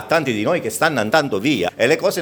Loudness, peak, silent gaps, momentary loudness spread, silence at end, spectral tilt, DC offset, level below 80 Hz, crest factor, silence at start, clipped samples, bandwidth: -18 LUFS; 0 dBFS; none; 3 LU; 0 s; -4.5 dB/octave; under 0.1%; -58 dBFS; 18 dB; 0 s; under 0.1%; over 20 kHz